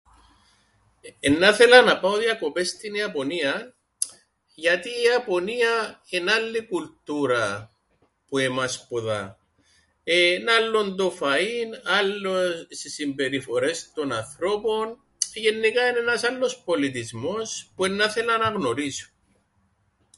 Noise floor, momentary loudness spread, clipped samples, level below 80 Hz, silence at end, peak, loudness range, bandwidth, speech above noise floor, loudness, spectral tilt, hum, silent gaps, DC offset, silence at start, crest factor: -67 dBFS; 11 LU; under 0.1%; -62 dBFS; 1.15 s; 0 dBFS; 7 LU; 11.5 kHz; 44 dB; -23 LUFS; -3 dB/octave; none; none; under 0.1%; 1.05 s; 24 dB